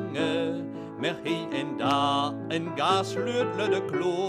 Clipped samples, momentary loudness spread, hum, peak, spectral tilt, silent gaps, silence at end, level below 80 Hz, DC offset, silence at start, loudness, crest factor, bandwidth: under 0.1%; 7 LU; none; -12 dBFS; -5 dB/octave; none; 0 s; -72 dBFS; under 0.1%; 0 s; -28 LUFS; 16 dB; 14 kHz